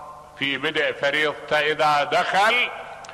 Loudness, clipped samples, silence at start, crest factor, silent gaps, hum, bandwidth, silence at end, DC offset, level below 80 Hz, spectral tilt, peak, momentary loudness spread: -21 LUFS; under 0.1%; 0 s; 14 dB; none; none; 13.5 kHz; 0 s; under 0.1%; -60 dBFS; -3 dB/octave; -10 dBFS; 8 LU